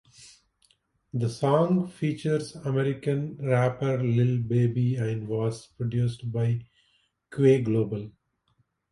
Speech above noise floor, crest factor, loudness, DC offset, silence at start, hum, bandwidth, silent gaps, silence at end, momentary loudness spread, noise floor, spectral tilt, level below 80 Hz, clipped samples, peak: 46 dB; 18 dB; -27 LUFS; under 0.1%; 0.2 s; none; 11.5 kHz; none; 0.8 s; 9 LU; -71 dBFS; -8 dB/octave; -60 dBFS; under 0.1%; -8 dBFS